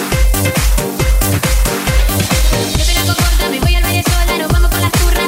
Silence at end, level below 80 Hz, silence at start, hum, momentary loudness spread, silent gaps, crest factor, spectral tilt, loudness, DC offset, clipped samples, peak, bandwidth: 0 s; -14 dBFS; 0 s; none; 2 LU; none; 12 dB; -4 dB/octave; -13 LUFS; under 0.1%; under 0.1%; 0 dBFS; 16.5 kHz